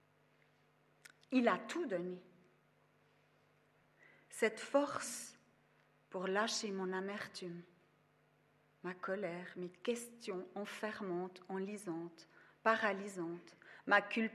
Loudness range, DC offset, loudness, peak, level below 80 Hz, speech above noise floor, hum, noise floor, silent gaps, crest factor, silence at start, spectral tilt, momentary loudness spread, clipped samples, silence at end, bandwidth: 6 LU; under 0.1%; -40 LUFS; -18 dBFS; under -90 dBFS; 34 dB; none; -73 dBFS; none; 24 dB; 1.3 s; -4 dB/octave; 16 LU; under 0.1%; 0 s; 13.5 kHz